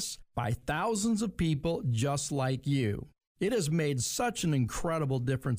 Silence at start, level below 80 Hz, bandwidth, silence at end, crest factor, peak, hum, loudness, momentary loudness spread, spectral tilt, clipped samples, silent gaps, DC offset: 0 s; -50 dBFS; 15.5 kHz; 0 s; 12 dB; -18 dBFS; none; -31 LUFS; 5 LU; -5.5 dB/octave; under 0.1%; 3.27-3.35 s; under 0.1%